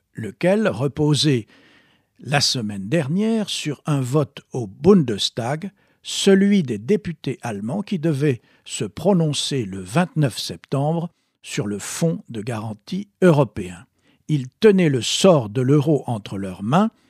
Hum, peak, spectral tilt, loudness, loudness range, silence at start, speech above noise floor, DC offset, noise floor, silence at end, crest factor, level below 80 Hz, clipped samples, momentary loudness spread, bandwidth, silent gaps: none; -2 dBFS; -5.5 dB/octave; -20 LUFS; 4 LU; 0.15 s; 37 dB; under 0.1%; -57 dBFS; 0.2 s; 18 dB; -56 dBFS; under 0.1%; 13 LU; 15 kHz; none